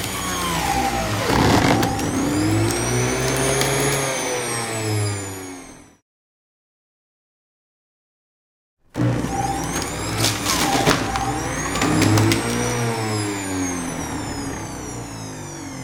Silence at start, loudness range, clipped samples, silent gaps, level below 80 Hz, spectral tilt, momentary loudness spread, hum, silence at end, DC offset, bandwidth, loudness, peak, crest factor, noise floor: 0 s; 10 LU; under 0.1%; 6.02-8.77 s; -38 dBFS; -4 dB/octave; 14 LU; none; 0 s; under 0.1%; 19 kHz; -21 LUFS; -2 dBFS; 20 dB; under -90 dBFS